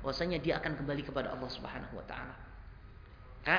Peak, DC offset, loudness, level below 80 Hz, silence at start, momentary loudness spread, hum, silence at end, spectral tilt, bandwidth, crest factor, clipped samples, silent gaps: -12 dBFS; under 0.1%; -38 LUFS; -52 dBFS; 0 s; 21 LU; none; 0 s; -3.5 dB/octave; 5.4 kHz; 24 dB; under 0.1%; none